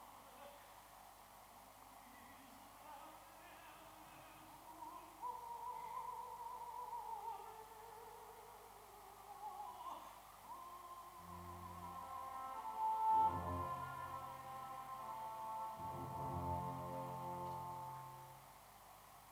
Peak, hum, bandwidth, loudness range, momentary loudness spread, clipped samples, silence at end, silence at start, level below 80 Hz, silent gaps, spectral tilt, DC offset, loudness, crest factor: -28 dBFS; 50 Hz at -75 dBFS; over 20 kHz; 16 LU; 16 LU; under 0.1%; 0 s; 0 s; -72 dBFS; none; -5 dB/octave; under 0.1%; -47 LUFS; 20 dB